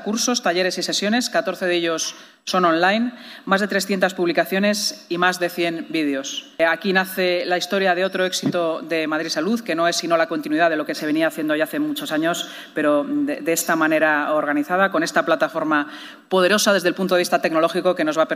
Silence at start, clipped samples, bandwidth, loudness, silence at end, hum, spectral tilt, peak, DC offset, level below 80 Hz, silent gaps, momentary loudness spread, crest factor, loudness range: 0 s; under 0.1%; 15.5 kHz; -20 LUFS; 0 s; none; -3.5 dB/octave; -4 dBFS; under 0.1%; -72 dBFS; none; 6 LU; 16 dB; 2 LU